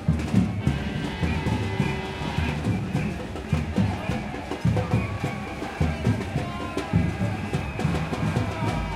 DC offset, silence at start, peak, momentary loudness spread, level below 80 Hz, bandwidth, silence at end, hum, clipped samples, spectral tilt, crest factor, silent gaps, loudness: under 0.1%; 0 s; -8 dBFS; 6 LU; -38 dBFS; 13.5 kHz; 0 s; none; under 0.1%; -7 dB/octave; 18 dB; none; -27 LUFS